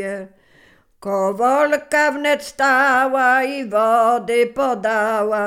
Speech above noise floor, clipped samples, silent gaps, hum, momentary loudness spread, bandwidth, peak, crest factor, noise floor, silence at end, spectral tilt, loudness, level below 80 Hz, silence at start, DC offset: 35 dB; under 0.1%; none; none; 6 LU; 16 kHz; -4 dBFS; 14 dB; -53 dBFS; 0 s; -3.5 dB/octave; -17 LUFS; -60 dBFS; 0 s; under 0.1%